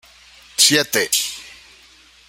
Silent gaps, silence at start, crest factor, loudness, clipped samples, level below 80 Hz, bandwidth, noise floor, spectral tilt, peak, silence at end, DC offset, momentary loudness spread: none; 0.6 s; 22 dB; -16 LUFS; under 0.1%; -60 dBFS; 16.5 kHz; -49 dBFS; -1 dB/octave; 0 dBFS; 0.75 s; under 0.1%; 15 LU